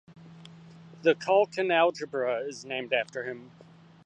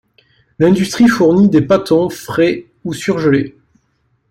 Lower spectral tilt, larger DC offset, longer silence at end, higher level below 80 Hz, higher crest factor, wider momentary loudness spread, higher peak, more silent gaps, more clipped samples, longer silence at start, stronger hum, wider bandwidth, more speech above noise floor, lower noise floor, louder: second, -4.5 dB/octave vs -6.5 dB/octave; neither; second, 0.6 s vs 0.8 s; second, -76 dBFS vs -48 dBFS; first, 20 dB vs 12 dB; about the same, 12 LU vs 11 LU; second, -10 dBFS vs -2 dBFS; neither; neither; second, 0.1 s vs 0.6 s; neither; second, 9 kHz vs 16.5 kHz; second, 22 dB vs 49 dB; second, -50 dBFS vs -62 dBFS; second, -28 LUFS vs -13 LUFS